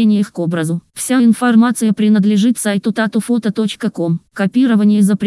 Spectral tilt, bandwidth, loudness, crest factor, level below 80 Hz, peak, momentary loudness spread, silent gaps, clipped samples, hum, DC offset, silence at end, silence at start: -6 dB/octave; 12 kHz; -14 LUFS; 12 dB; -66 dBFS; -2 dBFS; 8 LU; none; under 0.1%; none; under 0.1%; 0 s; 0 s